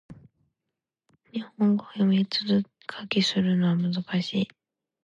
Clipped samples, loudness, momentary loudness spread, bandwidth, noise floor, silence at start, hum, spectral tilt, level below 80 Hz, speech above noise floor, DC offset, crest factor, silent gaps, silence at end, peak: under 0.1%; -25 LUFS; 13 LU; 7.8 kHz; -86 dBFS; 0.1 s; none; -6.5 dB/octave; -68 dBFS; 61 dB; under 0.1%; 18 dB; none; 0.55 s; -10 dBFS